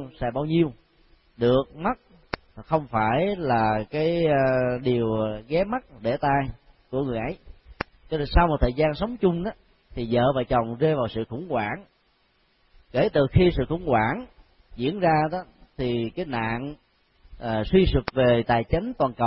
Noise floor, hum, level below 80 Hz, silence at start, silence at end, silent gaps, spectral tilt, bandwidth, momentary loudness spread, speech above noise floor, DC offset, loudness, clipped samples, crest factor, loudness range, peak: -65 dBFS; none; -38 dBFS; 0 s; 0 s; none; -11.5 dB/octave; 5.8 kHz; 13 LU; 42 dB; under 0.1%; -24 LUFS; under 0.1%; 20 dB; 3 LU; -4 dBFS